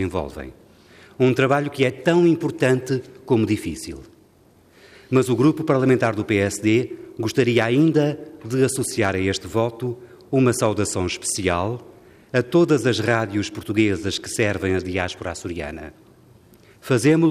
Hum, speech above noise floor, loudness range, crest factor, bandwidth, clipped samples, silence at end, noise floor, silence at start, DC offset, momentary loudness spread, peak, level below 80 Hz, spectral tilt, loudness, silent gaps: none; 34 dB; 3 LU; 16 dB; 15 kHz; under 0.1%; 0 s; -54 dBFS; 0 s; under 0.1%; 13 LU; -6 dBFS; -54 dBFS; -5.5 dB/octave; -21 LUFS; none